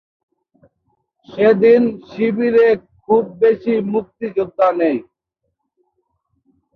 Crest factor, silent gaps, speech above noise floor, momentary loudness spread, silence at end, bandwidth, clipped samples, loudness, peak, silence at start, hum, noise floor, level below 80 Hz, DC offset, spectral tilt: 16 dB; none; 59 dB; 10 LU; 1.75 s; 4.9 kHz; under 0.1%; -16 LUFS; -2 dBFS; 1.3 s; none; -74 dBFS; -60 dBFS; under 0.1%; -8.5 dB/octave